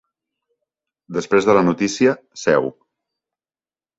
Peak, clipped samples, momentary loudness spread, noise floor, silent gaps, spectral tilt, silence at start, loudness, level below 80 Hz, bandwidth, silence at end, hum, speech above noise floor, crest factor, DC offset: -2 dBFS; under 0.1%; 12 LU; under -90 dBFS; none; -5.5 dB/octave; 1.1 s; -18 LUFS; -60 dBFS; 8 kHz; 1.3 s; none; over 73 dB; 18 dB; under 0.1%